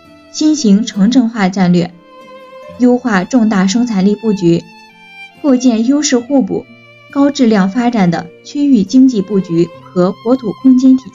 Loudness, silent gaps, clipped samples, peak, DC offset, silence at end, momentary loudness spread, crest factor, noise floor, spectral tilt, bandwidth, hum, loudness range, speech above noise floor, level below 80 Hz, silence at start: -12 LUFS; none; under 0.1%; 0 dBFS; under 0.1%; 0.05 s; 8 LU; 12 dB; -36 dBFS; -6 dB/octave; 7.6 kHz; none; 2 LU; 25 dB; -56 dBFS; 0.35 s